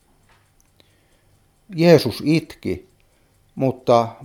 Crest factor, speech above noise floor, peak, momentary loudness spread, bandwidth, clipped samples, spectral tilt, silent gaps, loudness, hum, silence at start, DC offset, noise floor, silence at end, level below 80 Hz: 22 dB; 41 dB; 0 dBFS; 18 LU; 16.5 kHz; under 0.1%; -7 dB/octave; none; -19 LUFS; none; 1.7 s; under 0.1%; -59 dBFS; 0 s; -56 dBFS